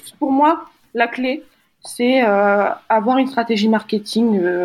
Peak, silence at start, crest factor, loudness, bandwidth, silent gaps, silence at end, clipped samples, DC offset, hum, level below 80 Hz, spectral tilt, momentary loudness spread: -2 dBFS; 0.05 s; 16 dB; -17 LUFS; 12.5 kHz; none; 0 s; under 0.1%; under 0.1%; none; -68 dBFS; -5.5 dB/octave; 9 LU